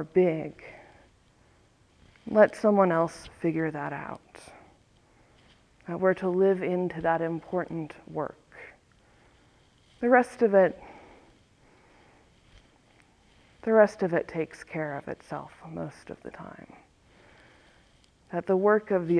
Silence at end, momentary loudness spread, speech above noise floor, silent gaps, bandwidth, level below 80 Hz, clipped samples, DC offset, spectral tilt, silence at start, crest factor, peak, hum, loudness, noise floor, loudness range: 0 s; 24 LU; 35 dB; none; 11 kHz; -64 dBFS; under 0.1%; under 0.1%; -7.5 dB/octave; 0 s; 22 dB; -6 dBFS; none; -27 LUFS; -62 dBFS; 9 LU